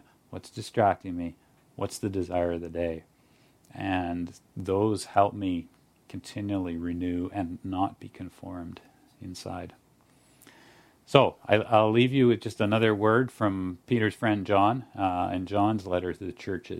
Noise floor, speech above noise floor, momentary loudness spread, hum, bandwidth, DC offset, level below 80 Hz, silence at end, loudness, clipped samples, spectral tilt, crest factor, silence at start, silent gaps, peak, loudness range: -62 dBFS; 35 dB; 18 LU; none; 14.5 kHz; under 0.1%; -58 dBFS; 0 s; -27 LUFS; under 0.1%; -6.5 dB/octave; 28 dB; 0.3 s; none; 0 dBFS; 10 LU